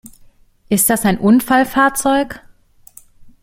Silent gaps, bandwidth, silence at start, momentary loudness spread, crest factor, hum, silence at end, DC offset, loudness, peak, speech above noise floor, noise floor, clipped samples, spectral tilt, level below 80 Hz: none; 16.5 kHz; 0.7 s; 8 LU; 16 dB; none; 0.15 s; under 0.1%; -14 LUFS; -2 dBFS; 33 dB; -47 dBFS; under 0.1%; -4 dB/octave; -44 dBFS